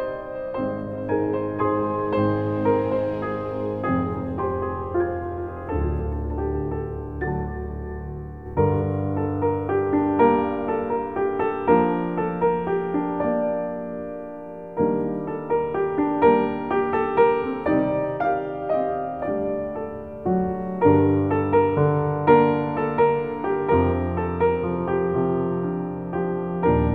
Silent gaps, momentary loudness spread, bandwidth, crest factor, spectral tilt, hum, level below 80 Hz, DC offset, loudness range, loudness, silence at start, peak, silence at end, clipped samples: none; 11 LU; 4.6 kHz; 18 dB; -11 dB/octave; none; -40 dBFS; 0.3%; 6 LU; -23 LUFS; 0 s; -4 dBFS; 0 s; under 0.1%